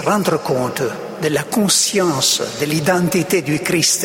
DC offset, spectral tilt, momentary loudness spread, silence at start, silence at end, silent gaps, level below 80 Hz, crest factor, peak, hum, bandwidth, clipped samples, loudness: under 0.1%; -3.5 dB/octave; 7 LU; 0 s; 0 s; none; -54 dBFS; 14 dB; -2 dBFS; none; 16.5 kHz; under 0.1%; -16 LUFS